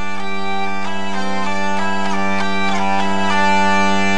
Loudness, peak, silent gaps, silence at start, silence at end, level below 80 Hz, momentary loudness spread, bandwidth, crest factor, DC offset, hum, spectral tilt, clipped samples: -19 LUFS; -4 dBFS; none; 0 s; 0 s; -50 dBFS; 8 LU; 10.5 kHz; 14 dB; 20%; none; -4.5 dB/octave; under 0.1%